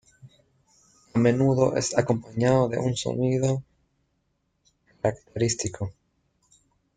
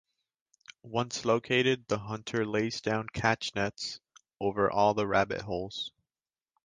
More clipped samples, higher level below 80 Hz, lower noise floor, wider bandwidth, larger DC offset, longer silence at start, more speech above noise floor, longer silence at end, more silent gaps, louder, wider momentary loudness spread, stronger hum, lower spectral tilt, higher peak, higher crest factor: neither; about the same, -56 dBFS vs -60 dBFS; second, -73 dBFS vs under -90 dBFS; about the same, 9.6 kHz vs 9.8 kHz; neither; second, 0.25 s vs 0.7 s; second, 50 dB vs over 60 dB; first, 1.05 s vs 0.75 s; neither; first, -25 LUFS vs -30 LUFS; about the same, 9 LU vs 11 LU; neither; first, -6 dB/octave vs -4.5 dB/octave; about the same, -6 dBFS vs -8 dBFS; about the same, 20 dB vs 22 dB